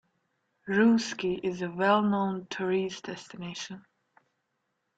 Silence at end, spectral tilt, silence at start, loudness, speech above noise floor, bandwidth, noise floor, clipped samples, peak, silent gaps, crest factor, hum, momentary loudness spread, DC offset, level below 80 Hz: 1.2 s; -5.5 dB/octave; 0.65 s; -28 LUFS; 51 dB; 8 kHz; -79 dBFS; under 0.1%; -10 dBFS; none; 20 dB; none; 16 LU; under 0.1%; -70 dBFS